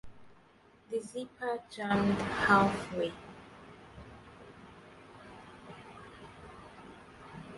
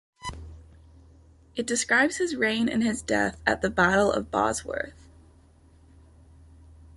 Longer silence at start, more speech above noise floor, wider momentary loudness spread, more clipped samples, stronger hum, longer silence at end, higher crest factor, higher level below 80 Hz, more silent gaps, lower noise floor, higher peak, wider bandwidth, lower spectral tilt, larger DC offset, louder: second, 0.05 s vs 0.2 s; about the same, 31 dB vs 31 dB; first, 26 LU vs 17 LU; neither; neither; second, 0 s vs 2.05 s; about the same, 24 dB vs 20 dB; second, -60 dBFS vs -50 dBFS; neither; first, -62 dBFS vs -56 dBFS; second, -12 dBFS vs -8 dBFS; about the same, 11.5 kHz vs 11.5 kHz; first, -6 dB/octave vs -3.5 dB/octave; neither; second, -31 LUFS vs -25 LUFS